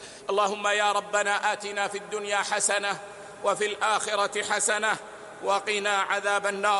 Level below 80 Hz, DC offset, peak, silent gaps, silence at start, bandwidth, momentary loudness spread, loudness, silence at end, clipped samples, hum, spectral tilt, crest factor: -74 dBFS; under 0.1%; -8 dBFS; none; 0 s; 11.5 kHz; 7 LU; -26 LUFS; 0 s; under 0.1%; none; -0.5 dB/octave; 18 dB